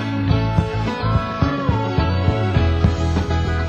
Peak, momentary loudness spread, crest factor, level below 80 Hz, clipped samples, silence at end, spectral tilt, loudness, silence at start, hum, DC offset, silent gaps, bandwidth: -2 dBFS; 3 LU; 16 dB; -24 dBFS; under 0.1%; 0 s; -7.5 dB/octave; -19 LUFS; 0 s; none; under 0.1%; none; 8 kHz